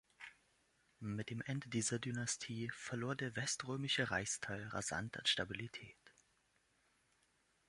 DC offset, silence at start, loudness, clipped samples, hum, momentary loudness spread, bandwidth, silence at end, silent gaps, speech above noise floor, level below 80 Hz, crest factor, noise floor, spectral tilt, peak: under 0.1%; 0.2 s; -41 LUFS; under 0.1%; none; 14 LU; 11.5 kHz; 1.6 s; none; 36 dB; -70 dBFS; 22 dB; -78 dBFS; -3 dB/octave; -22 dBFS